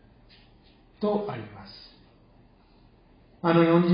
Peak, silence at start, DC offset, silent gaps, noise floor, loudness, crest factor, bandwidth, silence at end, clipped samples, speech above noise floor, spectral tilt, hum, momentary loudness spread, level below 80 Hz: -8 dBFS; 1 s; under 0.1%; none; -57 dBFS; -25 LUFS; 20 dB; 5.2 kHz; 0 s; under 0.1%; 34 dB; -11.5 dB/octave; none; 25 LU; -60 dBFS